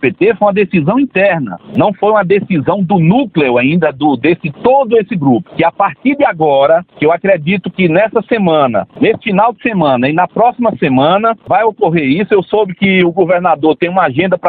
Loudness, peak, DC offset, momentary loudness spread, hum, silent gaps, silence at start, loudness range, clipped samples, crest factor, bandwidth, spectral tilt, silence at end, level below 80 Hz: -11 LUFS; 0 dBFS; under 0.1%; 3 LU; none; none; 0 s; 1 LU; under 0.1%; 10 dB; 4.5 kHz; -10.5 dB/octave; 0 s; -50 dBFS